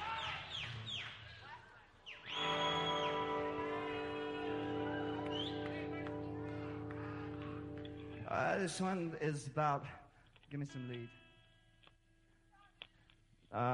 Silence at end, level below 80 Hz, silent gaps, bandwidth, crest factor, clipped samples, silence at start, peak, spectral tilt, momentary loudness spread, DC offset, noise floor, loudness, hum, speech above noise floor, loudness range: 0 s; -66 dBFS; none; 11 kHz; 20 dB; under 0.1%; 0 s; -22 dBFS; -5 dB/octave; 17 LU; under 0.1%; -71 dBFS; -41 LUFS; none; 31 dB; 7 LU